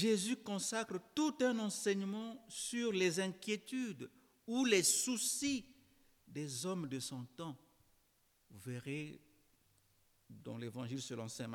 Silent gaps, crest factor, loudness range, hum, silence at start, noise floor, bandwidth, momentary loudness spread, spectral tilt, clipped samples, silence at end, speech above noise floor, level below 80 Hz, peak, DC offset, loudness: none; 20 dB; 14 LU; none; 0 s; -75 dBFS; 19 kHz; 16 LU; -3.5 dB/octave; under 0.1%; 0 s; 36 dB; -80 dBFS; -20 dBFS; under 0.1%; -38 LUFS